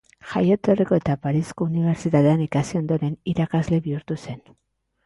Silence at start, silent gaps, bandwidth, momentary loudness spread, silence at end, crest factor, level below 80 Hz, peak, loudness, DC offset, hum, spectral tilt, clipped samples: 0.25 s; none; 11.5 kHz; 10 LU; 0.65 s; 16 dB; -52 dBFS; -6 dBFS; -22 LUFS; under 0.1%; none; -8 dB/octave; under 0.1%